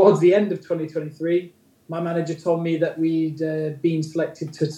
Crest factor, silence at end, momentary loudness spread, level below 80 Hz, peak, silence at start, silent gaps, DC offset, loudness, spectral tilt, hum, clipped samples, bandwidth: 20 dB; 0 s; 10 LU; -74 dBFS; -2 dBFS; 0 s; none; under 0.1%; -23 LUFS; -7.5 dB/octave; none; under 0.1%; 10.5 kHz